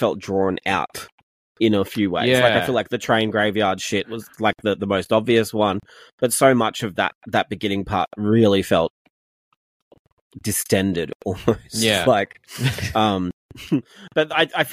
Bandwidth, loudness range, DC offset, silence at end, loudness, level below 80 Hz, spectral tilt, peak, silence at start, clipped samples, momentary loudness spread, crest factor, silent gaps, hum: 15.5 kHz; 3 LU; under 0.1%; 0 s; -20 LUFS; -52 dBFS; -4.5 dB/octave; -2 dBFS; 0 s; under 0.1%; 9 LU; 18 dB; 1.12-1.55 s, 6.13-6.18 s, 7.15-7.21 s, 8.90-9.91 s, 9.99-10.05 s, 10.12-10.30 s, 11.15-11.20 s, 13.33-13.49 s; none